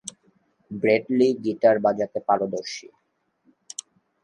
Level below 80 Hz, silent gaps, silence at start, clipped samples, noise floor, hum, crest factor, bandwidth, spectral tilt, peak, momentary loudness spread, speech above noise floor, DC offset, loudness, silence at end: -70 dBFS; none; 0.05 s; under 0.1%; -70 dBFS; none; 18 dB; 11.5 kHz; -5 dB/octave; -6 dBFS; 18 LU; 48 dB; under 0.1%; -22 LUFS; 1.4 s